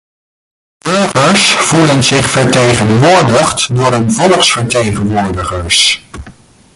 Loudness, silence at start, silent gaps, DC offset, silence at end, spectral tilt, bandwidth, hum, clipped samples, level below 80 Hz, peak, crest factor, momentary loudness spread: -9 LUFS; 0.85 s; none; under 0.1%; 0.45 s; -4 dB/octave; 11.5 kHz; none; under 0.1%; -34 dBFS; 0 dBFS; 10 dB; 7 LU